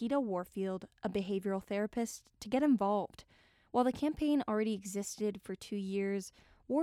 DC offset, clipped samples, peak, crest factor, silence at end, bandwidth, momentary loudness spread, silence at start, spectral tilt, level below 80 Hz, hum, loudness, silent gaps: under 0.1%; under 0.1%; -18 dBFS; 18 dB; 0 s; 15.5 kHz; 9 LU; 0 s; -5.5 dB/octave; -64 dBFS; none; -36 LUFS; none